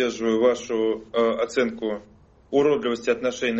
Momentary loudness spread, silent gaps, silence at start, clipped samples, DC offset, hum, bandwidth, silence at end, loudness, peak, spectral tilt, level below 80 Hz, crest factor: 6 LU; none; 0 s; under 0.1%; under 0.1%; none; 8 kHz; 0 s; -23 LUFS; -8 dBFS; -3.5 dB/octave; -58 dBFS; 16 dB